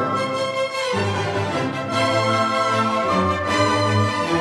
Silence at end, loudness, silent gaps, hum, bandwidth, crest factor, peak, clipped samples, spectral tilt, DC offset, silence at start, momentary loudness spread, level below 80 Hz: 0 s; -20 LUFS; none; none; 12.5 kHz; 14 dB; -8 dBFS; under 0.1%; -5 dB/octave; under 0.1%; 0 s; 4 LU; -54 dBFS